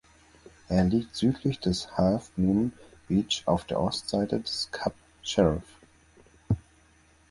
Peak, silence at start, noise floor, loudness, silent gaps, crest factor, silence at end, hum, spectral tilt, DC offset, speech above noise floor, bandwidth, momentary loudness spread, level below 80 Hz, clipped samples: -8 dBFS; 0.7 s; -60 dBFS; -28 LUFS; none; 20 dB; 0.7 s; none; -6 dB/octave; under 0.1%; 34 dB; 11.5 kHz; 7 LU; -48 dBFS; under 0.1%